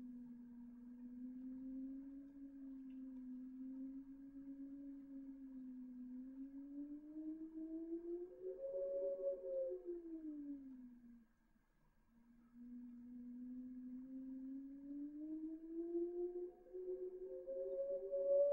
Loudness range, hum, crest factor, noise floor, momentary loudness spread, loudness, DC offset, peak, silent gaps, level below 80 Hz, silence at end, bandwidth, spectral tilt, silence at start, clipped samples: 9 LU; none; 20 dB; -77 dBFS; 12 LU; -50 LUFS; under 0.1%; -30 dBFS; none; -76 dBFS; 0 s; 2.4 kHz; -9.5 dB/octave; 0 s; under 0.1%